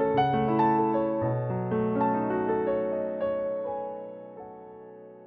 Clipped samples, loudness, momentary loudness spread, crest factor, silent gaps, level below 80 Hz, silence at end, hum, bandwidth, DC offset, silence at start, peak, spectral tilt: under 0.1%; -27 LUFS; 20 LU; 14 dB; none; -58 dBFS; 0 s; none; 5.6 kHz; under 0.1%; 0 s; -12 dBFS; -10.5 dB/octave